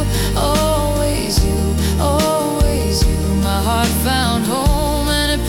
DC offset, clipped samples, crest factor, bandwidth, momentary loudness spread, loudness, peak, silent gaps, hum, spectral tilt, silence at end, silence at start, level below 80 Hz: under 0.1%; under 0.1%; 12 dB; 18 kHz; 2 LU; -16 LUFS; -2 dBFS; none; none; -5 dB/octave; 0 s; 0 s; -22 dBFS